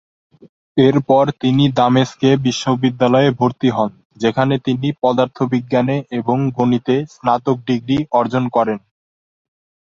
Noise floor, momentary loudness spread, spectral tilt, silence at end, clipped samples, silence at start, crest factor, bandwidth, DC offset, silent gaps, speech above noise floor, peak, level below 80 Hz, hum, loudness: under -90 dBFS; 6 LU; -7 dB/octave; 1.1 s; under 0.1%; 0.75 s; 16 dB; 7.8 kHz; under 0.1%; 4.05-4.10 s; over 75 dB; 0 dBFS; -54 dBFS; none; -16 LUFS